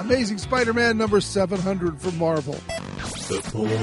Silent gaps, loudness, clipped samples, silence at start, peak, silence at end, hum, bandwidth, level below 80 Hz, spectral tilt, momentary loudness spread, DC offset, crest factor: none; -24 LUFS; under 0.1%; 0 s; -6 dBFS; 0 s; none; 11.5 kHz; -44 dBFS; -5 dB/octave; 11 LU; under 0.1%; 18 dB